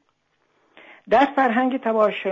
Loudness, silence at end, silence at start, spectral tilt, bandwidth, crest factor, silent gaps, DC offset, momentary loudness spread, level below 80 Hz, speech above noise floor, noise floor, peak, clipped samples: -20 LUFS; 0 s; 1.1 s; -6.5 dB/octave; 7.6 kHz; 16 dB; none; under 0.1%; 4 LU; -64 dBFS; 49 dB; -68 dBFS; -6 dBFS; under 0.1%